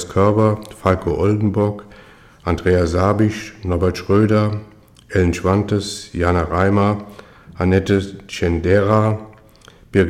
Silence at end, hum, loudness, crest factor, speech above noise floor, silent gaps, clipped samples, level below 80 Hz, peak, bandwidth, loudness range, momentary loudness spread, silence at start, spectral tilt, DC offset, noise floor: 0 s; none; -18 LUFS; 16 dB; 29 dB; none; under 0.1%; -38 dBFS; -2 dBFS; 12.5 kHz; 1 LU; 10 LU; 0 s; -7 dB/octave; under 0.1%; -46 dBFS